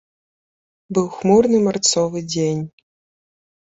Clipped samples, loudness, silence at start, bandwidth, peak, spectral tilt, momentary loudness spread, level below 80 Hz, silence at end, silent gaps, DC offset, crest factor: under 0.1%; -18 LUFS; 0.9 s; 8 kHz; -2 dBFS; -4.5 dB/octave; 10 LU; -56 dBFS; 0.95 s; none; under 0.1%; 18 dB